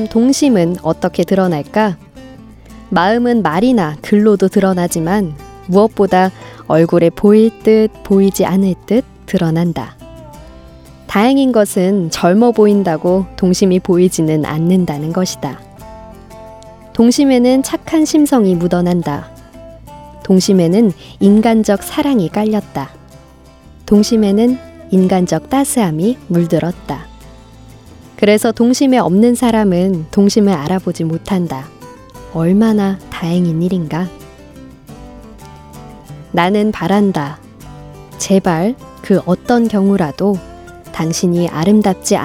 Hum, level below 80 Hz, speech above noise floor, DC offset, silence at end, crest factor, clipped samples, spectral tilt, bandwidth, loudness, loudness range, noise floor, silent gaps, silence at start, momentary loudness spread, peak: none; -42 dBFS; 28 dB; under 0.1%; 0 s; 14 dB; under 0.1%; -6 dB/octave; 16 kHz; -13 LUFS; 5 LU; -41 dBFS; none; 0 s; 11 LU; 0 dBFS